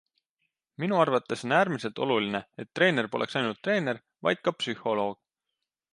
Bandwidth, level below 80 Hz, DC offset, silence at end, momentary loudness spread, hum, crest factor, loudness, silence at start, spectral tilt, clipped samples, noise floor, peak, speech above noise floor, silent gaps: 11.5 kHz; -74 dBFS; under 0.1%; 0.8 s; 8 LU; none; 20 dB; -28 LUFS; 0.8 s; -5.5 dB/octave; under 0.1%; -86 dBFS; -8 dBFS; 58 dB; none